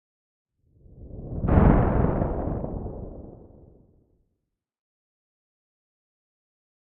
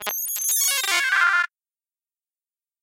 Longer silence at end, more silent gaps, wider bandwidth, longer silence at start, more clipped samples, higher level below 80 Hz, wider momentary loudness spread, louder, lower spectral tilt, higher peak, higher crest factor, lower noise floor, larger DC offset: first, 3.65 s vs 1.35 s; neither; second, 3.5 kHz vs 17 kHz; first, 0.95 s vs 0 s; neither; first, -34 dBFS vs -80 dBFS; first, 24 LU vs 6 LU; second, -24 LUFS vs -20 LUFS; first, -10.5 dB/octave vs 4 dB/octave; about the same, -4 dBFS vs -4 dBFS; about the same, 24 dB vs 20 dB; second, -80 dBFS vs under -90 dBFS; neither